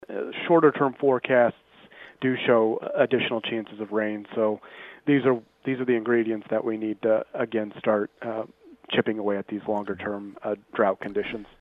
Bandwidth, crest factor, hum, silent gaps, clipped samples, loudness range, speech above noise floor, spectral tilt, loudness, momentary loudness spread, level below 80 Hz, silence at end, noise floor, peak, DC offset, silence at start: 4.1 kHz; 20 dB; none; none; under 0.1%; 5 LU; 24 dB; -8.5 dB/octave; -25 LUFS; 11 LU; -68 dBFS; 0.15 s; -49 dBFS; -6 dBFS; under 0.1%; 0.1 s